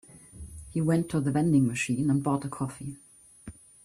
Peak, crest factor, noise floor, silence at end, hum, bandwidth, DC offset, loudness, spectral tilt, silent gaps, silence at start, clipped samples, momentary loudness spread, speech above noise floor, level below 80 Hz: -12 dBFS; 16 dB; -48 dBFS; 0.35 s; none; 13.5 kHz; under 0.1%; -27 LUFS; -6.5 dB/octave; none; 0.15 s; under 0.1%; 24 LU; 22 dB; -54 dBFS